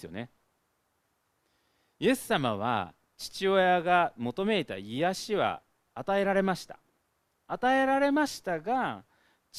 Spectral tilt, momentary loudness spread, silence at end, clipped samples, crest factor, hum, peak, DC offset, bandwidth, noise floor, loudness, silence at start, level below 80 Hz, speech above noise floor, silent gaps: -5 dB/octave; 17 LU; 0 s; under 0.1%; 20 dB; none; -10 dBFS; under 0.1%; 15.5 kHz; -75 dBFS; -28 LUFS; 0 s; -66 dBFS; 47 dB; none